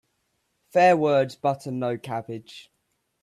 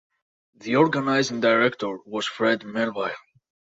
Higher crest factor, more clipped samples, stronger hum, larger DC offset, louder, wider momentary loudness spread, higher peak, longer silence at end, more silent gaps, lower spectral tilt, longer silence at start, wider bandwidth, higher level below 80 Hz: about the same, 18 dB vs 18 dB; neither; neither; neither; about the same, -23 LUFS vs -23 LUFS; first, 15 LU vs 11 LU; about the same, -6 dBFS vs -6 dBFS; about the same, 0.6 s vs 0.6 s; neither; first, -6.5 dB/octave vs -5 dB/octave; first, 0.75 s vs 0.6 s; first, 13.5 kHz vs 7.8 kHz; about the same, -70 dBFS vs -70 dBFS